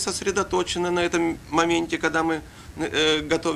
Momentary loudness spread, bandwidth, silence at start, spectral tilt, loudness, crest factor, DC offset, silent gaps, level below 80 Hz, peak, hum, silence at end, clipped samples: 6 LU; 14 kHz; 0 s; -3.5 dB/octave; -23 LUFS; 20 dB; under 0.1%; none; -48 dBFS; -4 dBFS; none; 0 s; under 0.1%